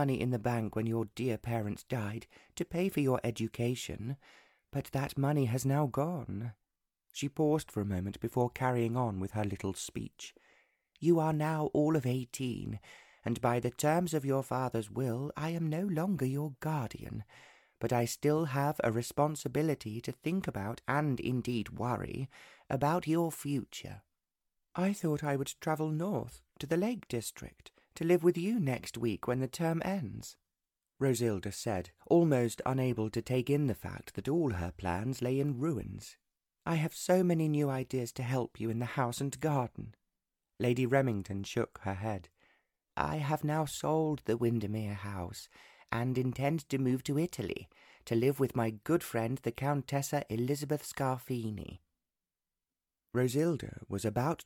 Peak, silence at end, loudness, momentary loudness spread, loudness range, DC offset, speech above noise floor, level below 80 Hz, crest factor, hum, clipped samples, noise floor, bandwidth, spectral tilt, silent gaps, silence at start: -14 dBFS; 0.05 s; -34 LUFS; 12 LU; 3 LU; under 0.1%; over 57 dB; -62 dBFS; 20 dB; none; under 0.1%; under -90 dBFS; 17.5 kHz; -6.5 dB/octave; none; 0 s